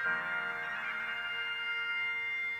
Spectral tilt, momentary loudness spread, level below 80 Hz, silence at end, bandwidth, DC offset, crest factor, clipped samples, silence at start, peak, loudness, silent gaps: -2 dB/octave; 3 LU; -74 dBFS; 0 s; 18.5 kHz; under 0.1%; 14 dB; under 0.1%; 0 s; -22 dBFS; -34 LUFS; none